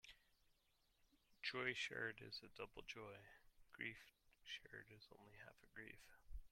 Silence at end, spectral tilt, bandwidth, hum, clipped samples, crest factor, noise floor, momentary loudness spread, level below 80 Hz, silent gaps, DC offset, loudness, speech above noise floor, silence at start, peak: 0.05 s; -3 dB/octave; 16.5 kHz; none; under 0.1%; 26 dB; -82 dBFS; 20 LU; -70 dBFS; none; under 0.1%; -51 LUFS; 28 dB; 0.05 s; -30 dBFS